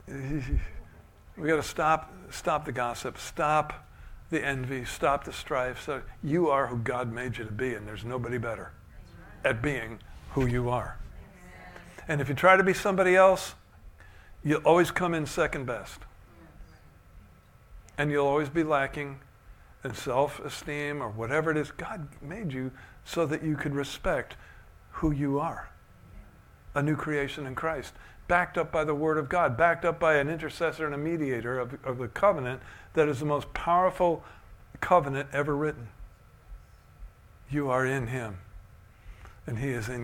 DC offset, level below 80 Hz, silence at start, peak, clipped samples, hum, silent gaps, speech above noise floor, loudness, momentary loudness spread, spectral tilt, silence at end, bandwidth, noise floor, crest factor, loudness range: under 0.1%; -48 dBFS; 0.05 s; -6 dBFS; under 0.1%; none; none; 27 dB; -28 LUFS; 16 LU; -6 dB/octave; 0 s; 17 kHz; -55 dBFS; 24 dB; 8 LU